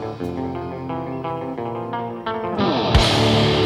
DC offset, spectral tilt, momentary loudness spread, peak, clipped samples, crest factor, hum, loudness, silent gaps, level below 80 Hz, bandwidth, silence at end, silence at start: under 0.1%; -5.5 dB/octave; 12 LU; -2 dBFS; under 0.1%; 20 dB; none; -21 LUFS; none; -32 dBFS; 14.5 kHz; 0 s; 0 s